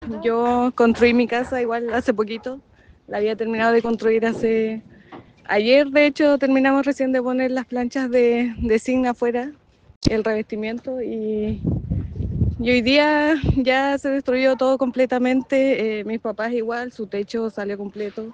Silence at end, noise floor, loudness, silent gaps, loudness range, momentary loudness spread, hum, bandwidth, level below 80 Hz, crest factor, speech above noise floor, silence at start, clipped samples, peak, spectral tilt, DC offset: 0 s; -44 dBFS; -20 LUFS; 9.96-10.01 s; 5 LU; 11 LU; none; 9 kHz; -40 dBFS; 16 dB; 24 dB; 0 s; under 0.1%; -4 dBFS; -6.5 dB/octave; under 0.1%